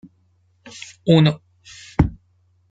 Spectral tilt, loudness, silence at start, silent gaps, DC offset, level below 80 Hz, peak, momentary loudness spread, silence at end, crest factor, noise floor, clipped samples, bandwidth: -7 dB/octave; -19 LUFS; 1.05 s; none; under 0.1%; -38 dBFS; -2 dBFS; 24 LU; 0.6 s; 20 dB; -61 dBFS; under 0.1%; 7.8 kHz